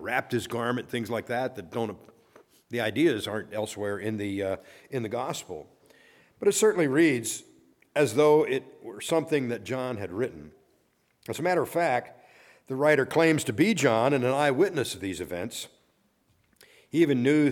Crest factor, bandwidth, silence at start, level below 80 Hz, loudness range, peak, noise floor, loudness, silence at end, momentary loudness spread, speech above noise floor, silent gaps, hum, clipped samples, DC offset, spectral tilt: 20 dB; 18 kHz; 0 s; -68 dBFS; 6 LU; -8 dBFS; -69 dBFS; -27 LUFS; 0 s; 14 LU; 42 dB; none; none; under 0.1%; under 0.1%; -5 dB/octave